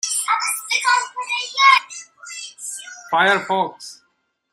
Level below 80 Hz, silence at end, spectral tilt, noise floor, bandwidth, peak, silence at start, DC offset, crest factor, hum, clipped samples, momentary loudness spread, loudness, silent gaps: -74 dBFS; 0.6 s; -0.5 dB/octave; -68 dBFS; 15.5 kHz; -2 dBFS; 0.05 s; under 0.1%; 20 dB; none; under 0.1%; 21 LU; -17 LUFS; none